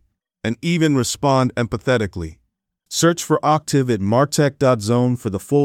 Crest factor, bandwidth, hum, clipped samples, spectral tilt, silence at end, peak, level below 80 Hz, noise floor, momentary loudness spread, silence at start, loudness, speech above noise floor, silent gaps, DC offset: 16 dB; 16.5 kHz; none; under 0.1%; -5.5 dB/octave; 0 s; -4 dBFS; -50 dBFS; -70 dBFS; 9 LU; 0.45 s; -19 LUFS; 53 dB; none; under 0.1%